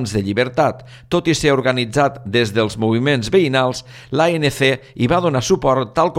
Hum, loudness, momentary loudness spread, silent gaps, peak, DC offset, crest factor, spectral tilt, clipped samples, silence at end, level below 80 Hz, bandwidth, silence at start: none; -17 LUFS; 5 LU; none; -2 dBFS; under 0.1%; 14 dB; -5.5 dB/octave; under 0.1%; 0 s; -44 dBFS; 15.5 kHz; 0 s